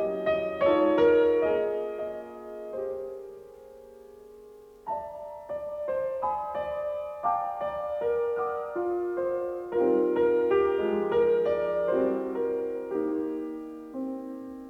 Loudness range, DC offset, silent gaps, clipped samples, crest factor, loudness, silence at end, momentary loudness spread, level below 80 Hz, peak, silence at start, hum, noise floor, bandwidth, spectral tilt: 12 LU; under 0.1%; none; under 0.1%; 16 dB; -28 LUFS; 0 s; 15 LU; -62 dBFS; -12 dBFS; 0 s; none; -50 dBFS; 5.8 kHz; -7.5 dB/octave